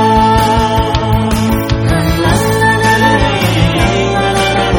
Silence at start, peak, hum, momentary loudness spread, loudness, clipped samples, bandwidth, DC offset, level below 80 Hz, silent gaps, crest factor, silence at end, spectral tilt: 0 s; 0 dBFS; none; 4 LU; -11 LUFS; under 0.1%; 19.5 kHz; under 0.1%; -22 dBFS; none; 10 dB; 0 s; -5.5 dB/octave